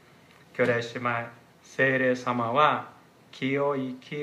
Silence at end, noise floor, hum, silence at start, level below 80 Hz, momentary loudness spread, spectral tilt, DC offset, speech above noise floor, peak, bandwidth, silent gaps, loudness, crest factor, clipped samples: 0 s; -55 dBFS; none; 0.55 s; -76 dBFS; 15 LU; -6 dB/octave; under 0.1%; 29 dB; -8 dBFS; 12.5 kHz; none; -26 LUFS; 20 dB; under 0.1%